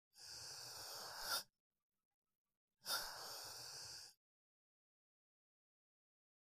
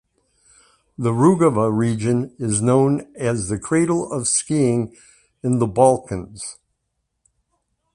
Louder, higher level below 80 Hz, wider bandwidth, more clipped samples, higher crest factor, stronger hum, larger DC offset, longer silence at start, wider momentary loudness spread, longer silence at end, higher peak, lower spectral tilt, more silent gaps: second, -48 LUFS vs -19 LUFS; second, -80 dBFS vs -50 dBFS; first, 15.5 kHz vs 11 kHz; neither; about the same, 24 dB vs 20 dB; neither; neither; second, 0.15 s vs 1 s; about the same, 11 LU vs 13 LU; first, 2.3 s vs 1.4 s; second, -30 dBFS vs -2 dBFS; second, 0.5 dB/octave vs -6 dB/octave; first, 1.60-1.71 s, 1.82-1.90 s, 2.05-2.22 s, 2.35-2.45 s, 2.57-2.68 s vs none